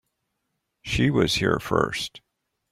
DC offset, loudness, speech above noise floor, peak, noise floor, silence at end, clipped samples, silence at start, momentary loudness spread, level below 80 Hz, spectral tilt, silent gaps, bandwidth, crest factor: under 0.1%; -23 LUFS; 55 dB; -6 dBFS; -78 dBFS; 0.55 s; under 0.1%; 0.85 s; 11 LU; -46 dBFS; -5 dB/octave; none; 16 kHz; 20 dB